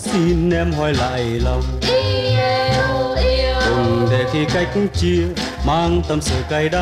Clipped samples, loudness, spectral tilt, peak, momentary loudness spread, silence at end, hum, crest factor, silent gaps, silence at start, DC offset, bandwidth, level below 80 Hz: under 0.1%; -18 LUFS; -5.5 dB/octave; -8 dBFS; 3 LU; 0 s; none; 10 dB; none; 0 s; under 0.1%; 14.5 kHz; -26 dBFS